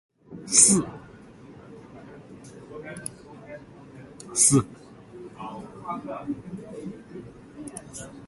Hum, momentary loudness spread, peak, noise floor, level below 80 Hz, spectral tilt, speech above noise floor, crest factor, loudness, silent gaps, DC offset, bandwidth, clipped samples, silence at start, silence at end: none; 28 LU; -2 dBFS; -47 dBFS; -60 dBFS; -3 dB/octave; 25 dB; 28 dB; -21 LUFS; none; under 0.1%; 12 kHz; under 0.1%; 0.3 s; 0 s